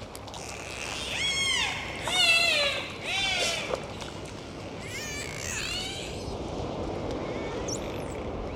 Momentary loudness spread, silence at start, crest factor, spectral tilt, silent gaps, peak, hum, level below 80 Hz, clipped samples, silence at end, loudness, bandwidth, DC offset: 15 LU; 0 s; 20 dB; -2 dB/octave; none; -10 dBFS; none; -46 dBFS; under 0.1%; 0 s; -28 LUFS; 16.5 kHz; under 0.1%